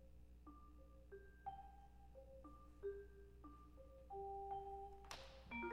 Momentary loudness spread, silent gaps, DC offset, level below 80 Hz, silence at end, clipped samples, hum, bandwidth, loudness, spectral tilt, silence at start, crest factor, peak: 14 LU; none; under 0.1%; -64 dBFS; 0 s; under 0.1%; 60 Hz at -65 dBFS; 13 kHz; -57 LUFS; -5.5 dB/octave; 0 s; 20 dB; -36 dBFS